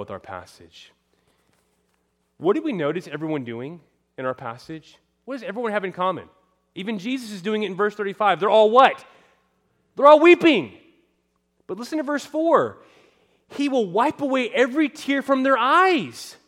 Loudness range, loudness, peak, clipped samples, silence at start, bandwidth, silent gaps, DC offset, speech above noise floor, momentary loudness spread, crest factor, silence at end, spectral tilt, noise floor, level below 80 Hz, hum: 12 LU; -20 LUFS; -2 dBFS; under 0.1%; 0 s; 13.5 kHz; none; under 0.1%; 49 dB; 21 LU; 20 dB; 0.15 s; -5 dB/octave; -70 dBFS; -72 dBFS; none